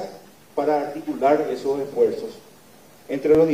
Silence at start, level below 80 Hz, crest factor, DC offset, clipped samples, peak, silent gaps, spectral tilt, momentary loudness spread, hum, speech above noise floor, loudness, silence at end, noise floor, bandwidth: 0 s; -56 dBFS; 16 dB; 0.1%; under 0.1%; -6 dBFS; none; -6.5 dB/octave; 13 LU; 50 Hz at -60 dBFS; 29 dB; -23 LUFS; 0 s; -50 dBFS; 16 kHz